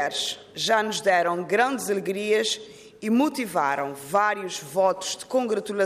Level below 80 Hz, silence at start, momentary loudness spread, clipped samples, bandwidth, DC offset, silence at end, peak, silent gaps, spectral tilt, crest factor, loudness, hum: -68 dBFS; 0 s; 7 LU; under 0.1%; 15.5 kHz; under 0.1%; 0 s; -10 dBFS; none; -3 dB/octave; 16 dB; -24 LUFS; none